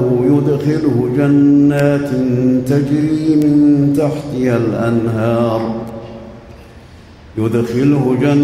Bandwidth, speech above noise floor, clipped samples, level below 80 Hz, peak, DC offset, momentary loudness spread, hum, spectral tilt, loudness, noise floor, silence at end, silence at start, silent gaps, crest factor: 12.5 kHz; 25 dB; under 0.1%; -44 dBFS; -2 dBFS; under 0.1%; 10 LU; none; -8.5 dB/octave; -14 LUFS; -38 dBFS; 0 s; 0 s; none; 10 dB